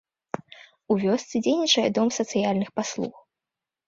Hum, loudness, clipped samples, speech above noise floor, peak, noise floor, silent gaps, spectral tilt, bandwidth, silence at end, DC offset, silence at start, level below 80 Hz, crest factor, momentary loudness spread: none; -24 LUFS; under 0.1%; 65 dB; -8 dBFS; -88 dBFS; none; -4 dB/octave; 7.8 kHz; 0.8 s; under 0.1%; 0.9 s; -66 dBFS; 18 dB; 16 LU